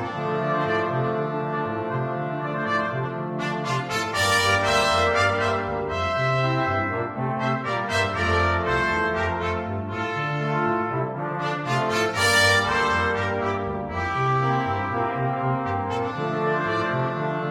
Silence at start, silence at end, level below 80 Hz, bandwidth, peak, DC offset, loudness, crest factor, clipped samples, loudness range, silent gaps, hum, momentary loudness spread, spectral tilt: 0 s; 0 s; -48 dBFS; 16 kHz; -6 dBFS; under 0.1%; -23 LUFS; 16 dB; under 0.1%; 4 LU; none; none; 8 LU; -4.5 dB/octave